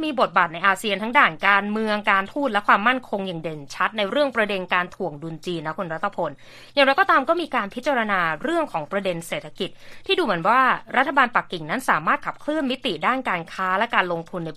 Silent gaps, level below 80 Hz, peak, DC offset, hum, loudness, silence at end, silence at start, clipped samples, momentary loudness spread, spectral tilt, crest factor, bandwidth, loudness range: none; -56 dBFS; 0 dBFS; under 0.1%; none; -22 LUFS; 0 s; 0 s; under 0.1%; 11 LU; -4.5 dB/octave; 22 dB; 14 kHz; 4 LU